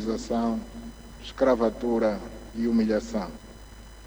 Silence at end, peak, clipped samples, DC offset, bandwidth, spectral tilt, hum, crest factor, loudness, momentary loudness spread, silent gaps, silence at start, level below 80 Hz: 0 s; -10 dBFS; under 0.1%; under 0.1%; over 20 kHz; -6 dB/octave; none; 18 dB; -26 LUFS; 21 LU; none; 0 s; -46 dBFS